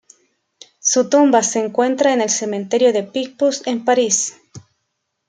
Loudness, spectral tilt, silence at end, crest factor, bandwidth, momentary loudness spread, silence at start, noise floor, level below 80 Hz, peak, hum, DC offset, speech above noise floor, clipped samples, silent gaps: -17 LUFS; -2.5 dB/octave; 0.7 s; 16 dB; 10 kHz; 7 LU; 0.85 s; -73 dBFS; -70 dBFS; -2 dBFS; none; under 0.1%; 57 dB; under 0.1%; none